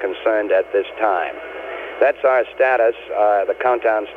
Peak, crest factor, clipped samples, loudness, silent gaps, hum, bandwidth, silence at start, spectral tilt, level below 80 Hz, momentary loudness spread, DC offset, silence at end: -4 dBFS; 14 dB; under 0.1%; -18 LUFS; none; none; 4.8 kHz; 0 s; -5 dB/octave; -58 dBFS; 12 LU; under 0.1%; 0 s